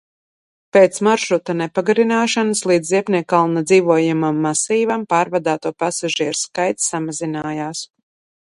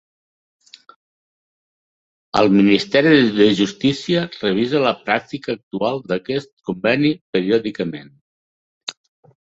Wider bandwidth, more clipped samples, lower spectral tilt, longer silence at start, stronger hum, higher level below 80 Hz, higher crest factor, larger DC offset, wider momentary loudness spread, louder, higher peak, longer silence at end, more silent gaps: first, 11.5 kHz vs 8 kHz; neither; second, -4 dB/octave vs -6 dB/octave; second, 0.75 s vs 2.35 s; neither; second, -64 dBFS vs -56 dBFS; about the same, 18 dB vs 18 dB; neither; second, 9 LU vs 14 LU; about the same, -17 LUFS vs -18 LUFS; about the same, 0 dBFS vs -2 dBFS; about the same, 0.6 s vs 0.5 s; second, none vs 5.63-5.71 s, 6.53-6.57 s, 7.21-7.33 s, 8.21-8.87 s